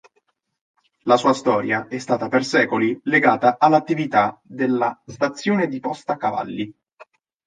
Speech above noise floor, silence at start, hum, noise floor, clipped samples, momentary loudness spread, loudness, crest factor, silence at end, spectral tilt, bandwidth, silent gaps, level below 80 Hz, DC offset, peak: 48 dB; 1.05 s; none; -68 dBFS; under 0.1%; 10 LU; -20 LUFS; 20 dB; 0.45 s; -5.5 dB/octave; 9.6 kHz; 6.93-6.97 s; -66 dBFS; under 0.1%; -2 dBFS